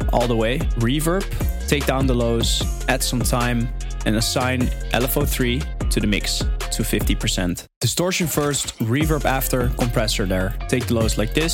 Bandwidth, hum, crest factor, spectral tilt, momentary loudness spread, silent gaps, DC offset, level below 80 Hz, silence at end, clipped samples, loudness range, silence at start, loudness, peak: 17 kHz; none; 18 dB; -4.5 dB/octave; 4 LU; 7.76-7.81 s; under 0.1%; -26 dBFS; 0 s; under 0.1%; 1 LU; 0 s; -21 LUFS; -2 dBFS